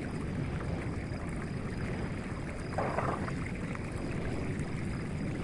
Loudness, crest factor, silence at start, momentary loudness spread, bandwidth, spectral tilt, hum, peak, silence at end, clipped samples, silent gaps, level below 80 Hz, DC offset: -36 LUFS; 18 dB; 0 s; 4 LU; 11.5 kHz; -7 dB/octave; none; -18 dBFS; 0 s; under 0.1%; none; -46 dBFS; under 0.1%